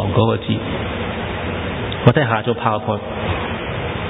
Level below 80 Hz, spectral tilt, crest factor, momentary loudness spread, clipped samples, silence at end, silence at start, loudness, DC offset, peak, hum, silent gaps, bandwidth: -34 dBFS; -10 dB/octave; 20 dB; 8 LU; under 0.1%; 0 s; 0 s; -20 LUFS; under 0.1%; 0 dBFS; none; none; 4 kHz